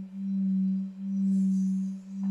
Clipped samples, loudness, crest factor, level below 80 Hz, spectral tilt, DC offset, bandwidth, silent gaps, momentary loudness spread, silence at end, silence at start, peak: under 0.1%; -29 LUFS; 8 dB; -76 dBFS; -9.5 dB/octave; under 0.1%; 7.6 kHz; none; 7 LU; 0 s; 0 s; -20 dBFS